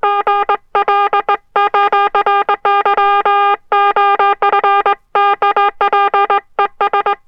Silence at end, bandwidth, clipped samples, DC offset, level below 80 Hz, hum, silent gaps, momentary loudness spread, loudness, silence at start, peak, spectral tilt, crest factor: 0.1 s; 5.6 kHz; under 0.1%; under 0.1%; -54 dBFS; none; none; 4 LU; -13 LUFS; 0.05 s; 0 dBFS; -3.5 dB/octave; 12 dB